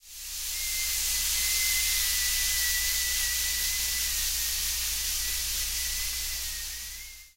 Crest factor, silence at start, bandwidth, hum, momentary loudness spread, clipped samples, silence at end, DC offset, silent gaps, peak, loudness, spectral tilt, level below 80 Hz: 16 dB; 0.05 s; 16 kHz; none; 9 LU; under 0.1%; 0.1 s; under 0.1%; none; -14 dBFS; -26 LUFS; 2 dB/octave; -42 dBFS